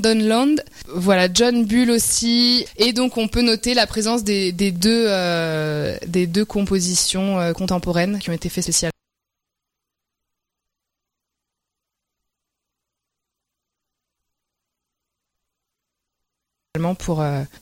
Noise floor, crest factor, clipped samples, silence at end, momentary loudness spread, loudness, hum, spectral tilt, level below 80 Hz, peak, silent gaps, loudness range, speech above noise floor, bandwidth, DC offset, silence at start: -83 dBFS; 18 dB; under 0.1%; 0.15 s; 8 LU; -18 LUFS; none; -4 dB/octave; -44 dBFS; -4 dBFS; none; 11 LU; 65 dB; 16.5 kHz; under 0.1%; 0 s